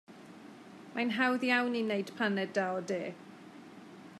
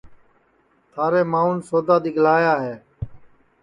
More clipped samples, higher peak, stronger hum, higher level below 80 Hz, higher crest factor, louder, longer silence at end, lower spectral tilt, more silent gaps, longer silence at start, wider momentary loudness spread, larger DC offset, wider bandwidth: neither; second, -16 dBFS vs -4 dBFS; neither; second, -90 dBFS vs -50 dBFS; about the same, 18 dB vs 16 dB; second, -32 LUFS vs -19 LUFS; second, 0 s vs 0.45 s; second, -5 dB/octave vs -7.5 dB/octave; neither; about the same, 0.1 s vs 0.05 s; first, 22 LU vs 19 LU; neither; first, 13 kHz vs 11 kHz